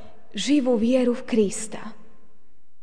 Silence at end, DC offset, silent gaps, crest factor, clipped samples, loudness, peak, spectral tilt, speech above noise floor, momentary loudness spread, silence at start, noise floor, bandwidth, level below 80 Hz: 0.9 s; 2%; none; 16 dB; under 0.1%; -22 LUFS; -8 dBFS; -4.5 dB/octave; 43 dB; 17 LU; 0.35 s; -65 dBFS; 10 kHz; -58 dBFS